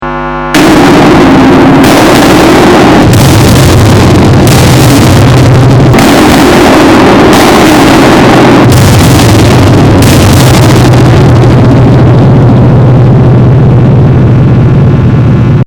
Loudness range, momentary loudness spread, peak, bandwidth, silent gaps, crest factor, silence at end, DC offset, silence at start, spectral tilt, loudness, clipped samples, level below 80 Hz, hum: 1 LU; 2 LU; 0 dBFS; over 20 kHz; none; 2 dB; 0 s; under 0.1%; 0 s; -6 dB/octave; -2 LUFS; 30%; -18 dBFS; none